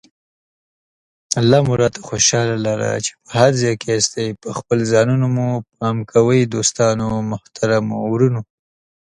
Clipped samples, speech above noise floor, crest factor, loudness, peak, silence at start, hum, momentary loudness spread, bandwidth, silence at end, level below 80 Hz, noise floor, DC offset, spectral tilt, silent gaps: under 0.1%; over 73 dB; 18 dB; -17 LUFS; 0 dBFS; 1.3 s; none; 9 LU; 11.5 kHz; 0.65 s; -50 dBFS; under -90 dBFS; under 0.1%; -4.5 dB/octave; none